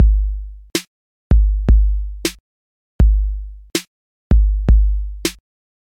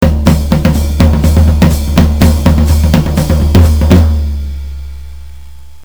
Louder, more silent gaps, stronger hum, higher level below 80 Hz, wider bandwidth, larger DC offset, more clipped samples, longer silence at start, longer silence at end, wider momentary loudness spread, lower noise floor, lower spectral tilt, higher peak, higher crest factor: second, -19 LUFS vs -9 LUFS; first, 0.87-1.30 s, 2.40-2.99 s, 3.87-4.30 s vs none; neither; about the same, -16 dBFS vs -12 dBFS; second, 15 kHz vs over 20 kHz; second, under 0.1% vs 4%; second, under 0.1% vs 1%; about the same, 0 s vs 0 s; first, 0.65 s vs 0.3 s; second, 9 LU vs 15 LU; first, under -90 dBFS vs -33 dBFS; second, -5.5 dB/octave vs -7 dB/octave; about the same, -2 dBFS vs 0 dBFS; first, 14 dB vs 8 dB